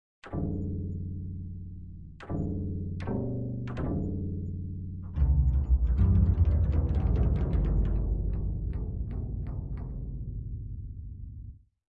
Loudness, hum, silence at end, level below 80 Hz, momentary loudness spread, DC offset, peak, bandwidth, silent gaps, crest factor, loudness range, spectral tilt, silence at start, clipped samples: -31 LUFS; none; 0.45 s; -32 dBFS; 16 LU; under 0.1%; -12 dBFS; 3.7 kHz; none; 16 dB; 9 LU; -11 dB/octave; 0.25 s; under 0.1%